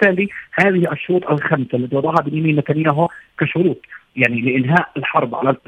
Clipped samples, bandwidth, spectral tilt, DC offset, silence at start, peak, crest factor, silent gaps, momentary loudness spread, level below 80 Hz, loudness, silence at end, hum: under 0.1%; 9.2 kHz; -8.5 dB/octave; under 0.1%; 0 s; 0 dBFS; 18 dB; none; 6 LU; -60 dBFS; -17 LUFS; 0.1 s; none